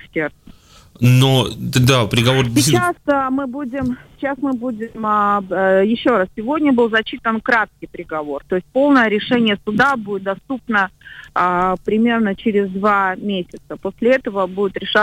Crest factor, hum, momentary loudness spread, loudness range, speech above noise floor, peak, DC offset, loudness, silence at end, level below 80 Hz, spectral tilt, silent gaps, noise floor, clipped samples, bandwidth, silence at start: 14 dB; none; 11 LU; 3 LU; 27 dB; -4 dBFS; under 0.1%; -17 LUFS; 0 s; -46 dBFS; -5.5 dB/octave; none; -44 dBFS; under 0.1%; 16 kHz; 0.15 s